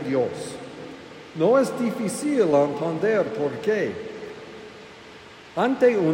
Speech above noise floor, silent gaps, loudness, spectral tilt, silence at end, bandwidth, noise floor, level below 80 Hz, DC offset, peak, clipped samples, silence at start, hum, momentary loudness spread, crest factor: 23 dB; none; -23 LUFS; -6 dB/octave; 0 s; 16 kHz; -44 dBFS; -66 dBFS; under 0.1%; -8 dBFS; under 0.1%; 0 s; none; 22 LU; 16 dB